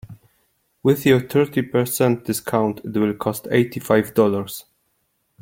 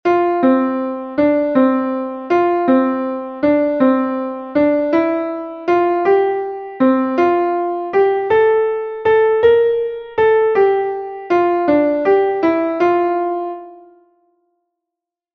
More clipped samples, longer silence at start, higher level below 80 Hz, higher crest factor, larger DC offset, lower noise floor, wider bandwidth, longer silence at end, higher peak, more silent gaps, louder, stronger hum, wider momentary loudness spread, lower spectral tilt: neither; about the same, 0.1 s vs 0.05 s; about the same, -58 dBFS vs -56 dBFS; about the same, 18 dB vs 14 dB; neither; second, -69 dBFS vs -84 dBFS; first, 17 kHz vs 6.2 kHz; second, 0.8 s vs 1.6 s; about the same, -2 dBFS vs -2 dBFS; neither; second, -20 LUFS vs -16 LUFS; neither; about the same, 7 LU vs 8 LU; second, -6 dB/octave vs -7.5 dB/octave